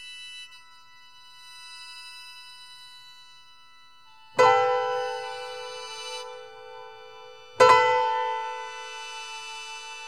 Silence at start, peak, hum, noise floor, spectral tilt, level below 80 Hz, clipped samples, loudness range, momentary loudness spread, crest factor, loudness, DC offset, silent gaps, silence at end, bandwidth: 0 s; -4 dBFS; none; -55 dBFS; -2 dB/octave; -70 dBFS; under 0.1%; 19 LU; 26 LU; 24 dB; -25 LUFS; 0.2%; none; 0 s; 13 kHz